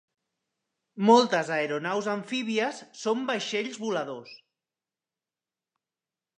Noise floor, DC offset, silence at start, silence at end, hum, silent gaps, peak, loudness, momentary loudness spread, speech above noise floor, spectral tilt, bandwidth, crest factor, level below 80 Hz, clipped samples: under -90 dBFS; under 0.1%; 0.95 s; 2 s; none; none; -6 dBFS; -27 LUFS; 12 LU; over 63 dB; -4.5 dB/octave; 10 kHz; 24 dB; -84 dBFS; under 0.1%